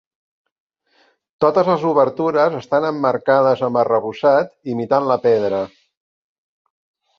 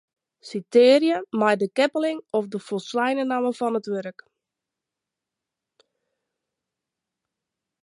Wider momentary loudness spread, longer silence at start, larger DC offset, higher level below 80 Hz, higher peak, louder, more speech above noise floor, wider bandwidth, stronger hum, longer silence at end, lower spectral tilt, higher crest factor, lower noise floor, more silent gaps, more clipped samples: second, 5 LU vs 14 LU; first, 1.4 s vs 0.45 s; neither; first, -62 dBFS vs -80 dBFS; first, -2 dBFS vs -6 dBFS; first, -17 LUFS vs -22 LUFS; second, 43 dB vs 65 dB; second, 6.8 kHz vs 11.5 kHz; neither; second, 1.5 s vs 3.75 s; first, -7.5 dB/octave vs -5 dB/octave; about the same, 18 dB vs 20 dB; second, -59 dBFS vs -86 dBFS; neither; neither